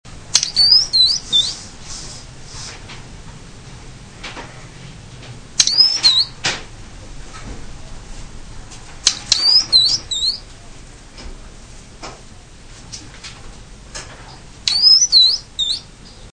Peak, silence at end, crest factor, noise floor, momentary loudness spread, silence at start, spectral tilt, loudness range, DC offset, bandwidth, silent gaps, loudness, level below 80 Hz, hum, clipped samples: 0 dBFS; 0.05 s; 20 dB; -39 dBFS; 26 LU; 0.05 s; 0.5 dB/octave; 20 LU; 0.1%; 11 kHz; none; -12 LUFS; -38 dBFS; none; under 0.1%